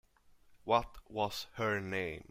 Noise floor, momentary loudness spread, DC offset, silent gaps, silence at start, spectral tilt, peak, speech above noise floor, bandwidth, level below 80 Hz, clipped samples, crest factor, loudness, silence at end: -64 dBFS; 8 LU; under 0.1%; none; 0.5 s; -5 dB/octave; -14 dBFS; 28 dB; 16 kHz; -60 dBFS; under 0.1%; 22 dB; -36 LUFS; 0.1 s